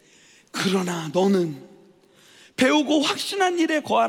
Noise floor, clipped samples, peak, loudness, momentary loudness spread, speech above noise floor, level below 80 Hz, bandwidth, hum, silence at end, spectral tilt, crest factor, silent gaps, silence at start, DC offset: -54 dBFS; under 0.1%; -6 dBFS; -22 LUFS; 11 LU; 33 dB; -70 dBFS; 17 kHz; none; 0 s; -4.5 dB/octave; 16 dB; none; 0.55 s; under 0.1%